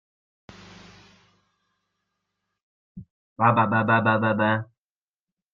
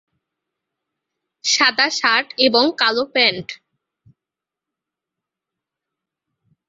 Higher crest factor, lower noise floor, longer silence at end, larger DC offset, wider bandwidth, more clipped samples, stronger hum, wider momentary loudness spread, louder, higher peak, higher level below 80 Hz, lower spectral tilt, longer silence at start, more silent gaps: about the same, 22 dB vs 22 dB; about the same, under -90 dBFS vs -87 dBFS; second, 0.9 s vs 3.15 s; neither; second, 6.8 kHz vs 8 kHz; neither; neither; about the same, 7 LU vs 9 LU; second, -21 LUFS vs -16 LUFS; second, -6 dBFS vs 0 dBFS; about the same, -66 dBFS vs -68 dBFS; first, -8.5 dB/octave vs -1 dB/octave; first, 2.95 s vs 1.45 s; first, 3.10-3.36 s vs none